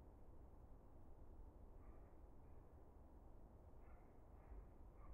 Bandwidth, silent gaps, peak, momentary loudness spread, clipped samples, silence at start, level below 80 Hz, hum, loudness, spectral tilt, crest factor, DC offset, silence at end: 2.8 kHz; none; -48 dBFS; 3 LU; under 0.1%; 0 s; -64 dBFS; none; -66 LUFS; -7.5 dB/octave; 12 dB; under 0.1%; 0 s